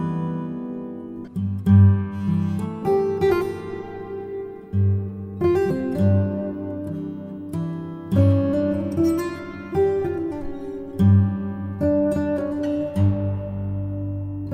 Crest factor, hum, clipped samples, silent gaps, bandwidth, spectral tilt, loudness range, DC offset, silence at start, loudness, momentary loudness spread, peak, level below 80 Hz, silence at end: 16 dB; none; under 0.1%; none; 9.2 kHz; -9.5 dB/octave; 3 LU; under 0.1%; 0 s; -23 LUFS; 14 LU; -4 dBFS; -46 dBFS; 0 s